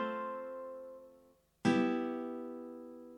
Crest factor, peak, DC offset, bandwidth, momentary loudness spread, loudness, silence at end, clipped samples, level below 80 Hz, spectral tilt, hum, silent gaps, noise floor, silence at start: 20 dB; -18 dBFS; under 0.1%; 10 kHz; 18 LU; -37 LUFS; 0 s; under 0.1%; -82 dBFS; -6.5 dB/octave; 50 Hz at -60 dBFS; none; -66 dBFS; 0 s